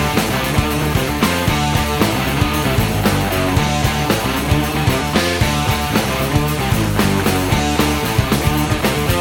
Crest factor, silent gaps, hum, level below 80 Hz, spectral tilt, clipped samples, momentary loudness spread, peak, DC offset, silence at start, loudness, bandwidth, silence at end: 16 dB; none; none; -26 dBFS; -5 dB/octave; under 0.1%; 1 LU; 0 dBFS; under 0.1%; 0 s; -16 LUFS; 17.5 kHz; 0 s